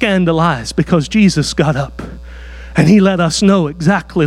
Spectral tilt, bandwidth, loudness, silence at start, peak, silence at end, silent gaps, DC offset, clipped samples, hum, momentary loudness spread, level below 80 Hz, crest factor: -6 dB/octave; 12 kHz; -13 LUFS; 0 s; 0 dBFS; 0 s; none; under 0.1%; under 0.1%; none; 20 LU; -34 dBFS; 12 dB